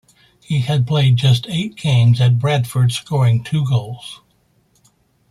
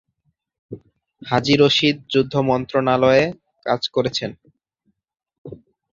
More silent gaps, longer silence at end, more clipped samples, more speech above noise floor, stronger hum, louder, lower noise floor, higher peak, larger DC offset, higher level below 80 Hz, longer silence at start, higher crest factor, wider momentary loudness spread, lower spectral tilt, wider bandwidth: second, none vs 5.38-5.45 s; first, 1.15 s vs 0.4 s; neither; second, 44 dB vs 52 dB; neither; about the same, -16 LUFS vs -18 LUFS; second, -59 dBFS vs -70 dBFS; about the same, -4 dBFS vs -2 dBFS; neither; about the same, -52 dBFS vs -54 dBFS; second, 0.5 s vs 0.7 s; about the same, 14 dB vs 18 dB; second, 9 LU vs 25 LU; about the same, -6.5 dB/octave vs -5.5 dB/octave; first, 13 kHz vs 7.6 kHz